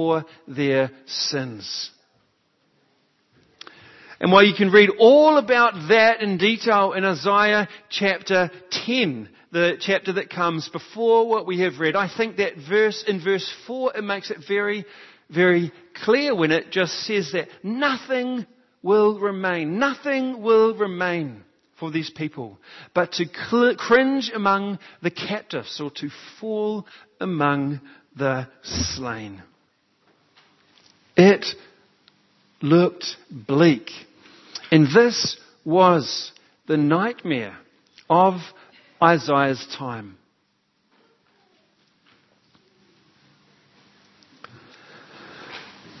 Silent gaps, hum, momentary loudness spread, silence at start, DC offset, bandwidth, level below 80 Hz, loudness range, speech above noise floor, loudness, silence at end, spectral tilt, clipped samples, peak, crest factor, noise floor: none; none; 16 LU; 0 s; under 0.1%; 6.2 kHz; -60 dBFS; 10 LU; 48 dB; -21 LUFS; 0.3 s; -5.5 dB/octave; under 0.1%; 0 dBFS; 22 dB; -68 dBFS